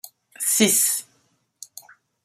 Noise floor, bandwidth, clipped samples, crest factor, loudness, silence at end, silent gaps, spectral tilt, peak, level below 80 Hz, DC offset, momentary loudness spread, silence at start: -66 dBFS; 16 kHz; under 0.1%; 22 dB; -19 LUFS; 1.2 s; none; -1.5 dB/octave; -4 dBFS; -70 dBFS; under 0.1%; 24 LU; 0.05 s